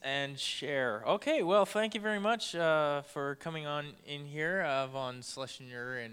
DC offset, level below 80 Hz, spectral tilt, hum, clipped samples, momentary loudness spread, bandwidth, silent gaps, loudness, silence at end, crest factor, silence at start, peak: under 0.1%; -76 dBFS; -4 dB/octave; none; under 0.1%; 13 LU; 16 kHz; none; -33 LUFS; 0 s; 20 dB; 0 s; -14 dBFS